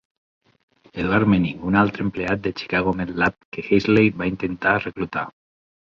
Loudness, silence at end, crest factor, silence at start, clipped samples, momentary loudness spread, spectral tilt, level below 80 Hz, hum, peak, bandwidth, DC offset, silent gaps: -21 LUFS; 0.65 s; 18 dB; 0.95 s; under 0.1%; 10 LU; -8 dB/octave; -46 dBFS; none; -4 dBFS; 7.2 kHz; under 0.1%; 3.45-3.52 s